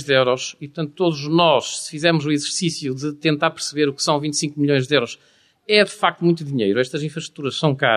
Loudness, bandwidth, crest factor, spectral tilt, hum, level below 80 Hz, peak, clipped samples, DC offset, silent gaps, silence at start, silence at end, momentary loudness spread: -20 LUFS; 13.5 kHz; 18 dB; -4.5 dB/octave; none; -64 dBFS; -2 dBFS; under 0.1%; under 0.1%; none; 0 s; 0 s; 10 LU